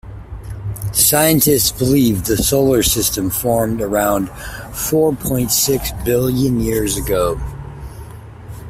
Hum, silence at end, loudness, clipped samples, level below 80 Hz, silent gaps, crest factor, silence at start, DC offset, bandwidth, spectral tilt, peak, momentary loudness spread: none; 0 s; -15 LUFS; under 0.1%; -32 dBFS; none; 16 dB; 0.05 s; under 0.1%; 16 kHz; -4 dB/octave; 0 dBFS; 20 LU